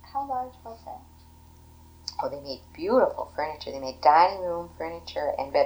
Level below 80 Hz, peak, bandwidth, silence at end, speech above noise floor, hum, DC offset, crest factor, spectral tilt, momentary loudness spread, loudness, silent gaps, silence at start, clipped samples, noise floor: -54 dBFS; -6 dBFS; over 20 kHz; 0 s; 25 dB; 60 Hz at -60 dBFS; under 0.1%; 22 dB; -5 dB/octave; 20 LU; -27 LUFS; none; 0.05 s; under 0.1%; -51 dBFS